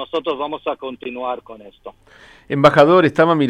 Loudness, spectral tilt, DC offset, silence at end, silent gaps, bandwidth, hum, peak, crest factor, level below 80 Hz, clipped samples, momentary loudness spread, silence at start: -16 LUFS; -7 dB/octave; under 0.1%; 0 s; none; 10.5 kHz; none; 0 dBFS; 18 dB; -54 dBFS; under 0.1%; 17 LU; 0 s